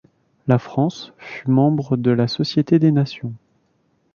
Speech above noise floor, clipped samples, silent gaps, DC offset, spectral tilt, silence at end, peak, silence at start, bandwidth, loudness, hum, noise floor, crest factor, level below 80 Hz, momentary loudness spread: 46 dB; under 0.1%; none; under 0.1%; -8 dB/octave; 0.8 s; -2 dBFS; 0.45 s; 7 kHz; -19 LUFS; none; -64 dBFS; 18 dB; -58 dBFS; 16 LU